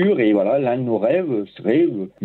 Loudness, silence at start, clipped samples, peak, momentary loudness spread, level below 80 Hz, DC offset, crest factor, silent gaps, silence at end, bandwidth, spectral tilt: -19 LUFS; 0 s; under 0.1%; -6 dBFS; 5 LU; -66 dBFS; under 0.1%; 12 dB; none; 0 s; 4.3 kHz; -9.5 dB/octave